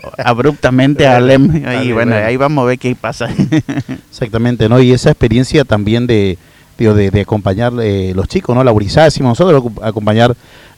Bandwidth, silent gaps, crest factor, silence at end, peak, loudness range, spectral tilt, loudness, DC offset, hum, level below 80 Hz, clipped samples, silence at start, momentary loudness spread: 12.5 kHz; none; 10 dB; 0.45 s; 0 dBFS; 2 LU; -7 dB/octave; -11 LUFS; under 0.1%; none; -32 dBFS; under 0.1%; 0.05 s; 9 LU